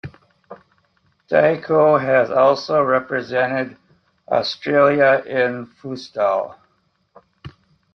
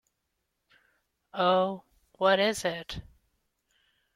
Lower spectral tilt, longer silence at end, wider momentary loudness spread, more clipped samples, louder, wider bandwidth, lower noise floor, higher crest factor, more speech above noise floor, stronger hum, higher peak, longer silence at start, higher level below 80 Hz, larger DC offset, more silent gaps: first, -6.5 dB/octave vs -4 dB/octave; second, 0.45 s vs 1.15 s; about the same, 16 LU vs 18 LU; neither; first, -18 LUFS vs -27 LUFS; second, 6.4 kHz vs 16 kHz; second, -65 dBFS vs -81 dBFS; about the same, 18 dB vs 20 dB; second, 47 dB vs 54 dB; neither; first, -2 dBFS vs -10 dBFS; second, 0.05 s vs 1.35 s; about the same, -60 dBFS vs -60 dBFS; neither; neither